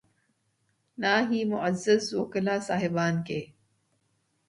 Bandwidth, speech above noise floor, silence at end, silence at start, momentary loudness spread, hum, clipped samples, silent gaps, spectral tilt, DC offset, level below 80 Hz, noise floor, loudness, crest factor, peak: 11.5 kHz; 46 dB; 1.05 s; 1 s; 6 LU; none; under 0.1%; none; -5.5 dB/octave; under 0.1%; -68 dBFS; -73 dBFS; -27 LUFS; 20 dB; -10 dBFS